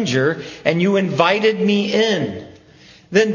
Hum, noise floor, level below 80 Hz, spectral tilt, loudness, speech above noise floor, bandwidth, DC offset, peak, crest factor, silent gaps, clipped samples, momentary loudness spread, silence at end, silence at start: none; -46 dBFS; -56 dBFS; -5.5 dB/octave; -17 LUFS; 29 dB; 7.4 kHz; under 0.1%; 0 dBFS; 18 dB; none; under 0.1%; 7 LU; 0 s; 0 s